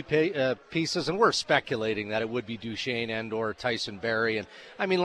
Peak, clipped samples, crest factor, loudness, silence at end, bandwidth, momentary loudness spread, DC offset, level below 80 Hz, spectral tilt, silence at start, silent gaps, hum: -8 dBFS; under 0.1%; 20 dB; -28 LUFS; 0 s; 11 kHz; 9 LU; under 0.1%; -64 dBFS; -4.5 dB/octave; 0 s; none; none